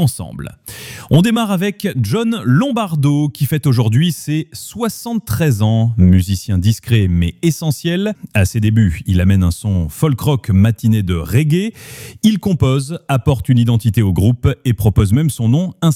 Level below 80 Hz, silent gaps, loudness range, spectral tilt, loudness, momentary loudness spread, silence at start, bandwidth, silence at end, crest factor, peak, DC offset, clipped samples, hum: -34 dBFS; none; 1 LU; -6.5 dB/octave; -15 LUFS; 8 LU; 0 s; 16.5 kHz; 0 s; 12 dB; -2 dBFS; under 0.1%; under 0.1%; none